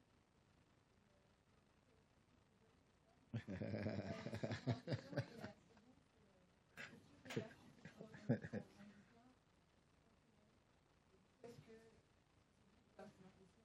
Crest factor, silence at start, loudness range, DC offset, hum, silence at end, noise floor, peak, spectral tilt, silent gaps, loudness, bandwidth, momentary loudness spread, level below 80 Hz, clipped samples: 26 dB; 2.6 s; 19 LU; under 0.1%; none; 0.15 s; -76 dBFS; -28 dBFS; -7 dB/octave; none; -50 LUFS; 12 kHz; 20 LU; -84 dBFS; under 0.1%